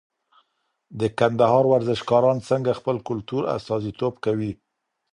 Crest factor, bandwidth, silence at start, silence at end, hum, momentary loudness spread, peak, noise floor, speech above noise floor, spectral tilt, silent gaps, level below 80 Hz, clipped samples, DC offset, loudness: 20 dB; 11 kHz; 0.9 s; 0.6 s; none; 10 LU; -4 dBFS; -71 dBFS; 50 dB; -7 dB/octave; none; -56 dBFS; under 0.1%; under 0.1%; -22 LUFS